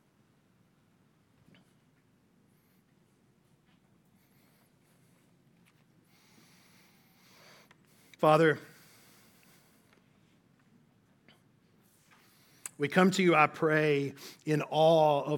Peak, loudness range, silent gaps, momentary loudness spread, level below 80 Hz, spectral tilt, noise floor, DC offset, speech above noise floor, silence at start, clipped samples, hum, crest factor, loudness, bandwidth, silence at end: -8 dBFS; 9 LU; none; 15 LU; -82 dBFS; -6 dB/octave; -68 dBFS; under 0.1%; 42 dB; 8.2 s; under 0.1%; none; 26 dB; -27 LUFS; 17.5 kHz; 0 s